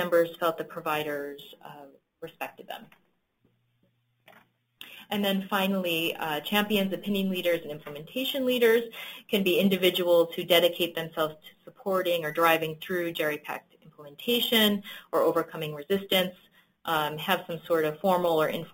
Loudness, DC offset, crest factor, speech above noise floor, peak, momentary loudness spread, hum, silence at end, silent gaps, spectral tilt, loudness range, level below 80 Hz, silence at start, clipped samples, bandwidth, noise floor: -27 LUFS; under 0.1%; 22 dB; 44 dB; -6 dBFS; 17 LU; none; 0.05 s; none; -4.5 dB/octave; 12 LU; -70 dBFS; 0 s; under 0.1%; 17 kHz; -71 dBFS